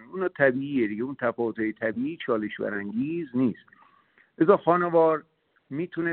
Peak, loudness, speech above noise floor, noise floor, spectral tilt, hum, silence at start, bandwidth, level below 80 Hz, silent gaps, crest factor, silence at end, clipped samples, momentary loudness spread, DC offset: -4 dBFS; -26 LUFS; 36 dB; -62 dBFS; -6 dB/octave; none; 0 s; 4.3 kHz; -68 dBFS; none; 22 dB; 0 s; under 0.1%; 10 LU; under 0.1%